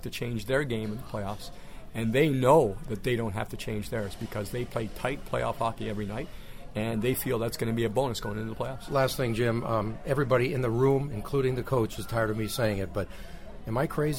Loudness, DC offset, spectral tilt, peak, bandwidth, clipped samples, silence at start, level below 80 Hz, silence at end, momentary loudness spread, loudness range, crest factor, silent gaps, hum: -29 LUFS; 0.6%; -6 dB/octave; -8 dBFS; 16.5 kHz; under 0.1%; 0 s; -44 dBFS; 0 s; 11 LU; 5 LU; 20 dB; none; none